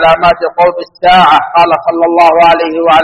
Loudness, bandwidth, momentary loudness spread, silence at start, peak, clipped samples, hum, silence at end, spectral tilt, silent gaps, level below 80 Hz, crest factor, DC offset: -7 LUFS; 9.8 kHz; 5 LU; 0 s; 0 dBFS; 2%; none; 0 s; -5.5 dB/octave; none; -38 dBFS; 8 dB; under 0.1%